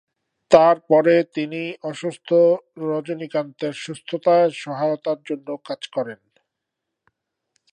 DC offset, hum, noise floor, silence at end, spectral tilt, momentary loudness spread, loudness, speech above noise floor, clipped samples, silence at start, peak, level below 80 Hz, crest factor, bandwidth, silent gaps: under 0.1%; none; -82 dBFS; 1.6 s; -6 dB/octave; 14 LU; -20 LUFS; 62 dB; under 0.1%; 0.5 s; 0 dBFS; -66 dBFS; 22 dB; 9.6 kHz; none